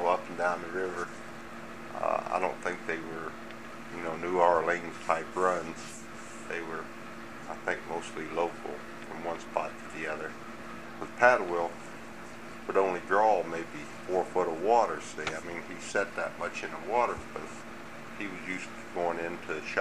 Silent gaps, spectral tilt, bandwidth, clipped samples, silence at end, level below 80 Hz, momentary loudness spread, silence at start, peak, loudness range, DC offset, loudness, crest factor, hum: none; -4.5 dB/octave; 15 kHz; under 0.1%; 0 s; -64 dBFS; 17 LU; 0 s; -6 dBFS; 7 LU; 0.4%; -32 LUFS; 26 dB; none